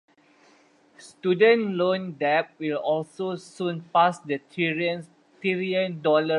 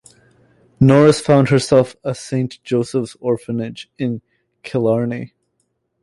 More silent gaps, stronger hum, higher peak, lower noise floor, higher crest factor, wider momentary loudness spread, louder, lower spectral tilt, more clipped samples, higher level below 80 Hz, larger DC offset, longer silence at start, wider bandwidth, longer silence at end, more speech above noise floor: neither; neither; second, -6 dBFS vs -2 dBFS; second, -58 dBFS vs -69 dBFS; about the same, 18 dB vs 16 dB; second, 12 LU vs 16 LU; second, -25 LUFS vs -17 LUFS; about the same, -6 dB/octave vs -7 dB/octave; neither; second, -78 dBFS vs -52 dBFS; neither; first, 1 s vs 0.8 s; about the same, 11 kHz vs 11.5 kHz; second, 0 s vs 0.75 s; second, 34 dB vs 53 dB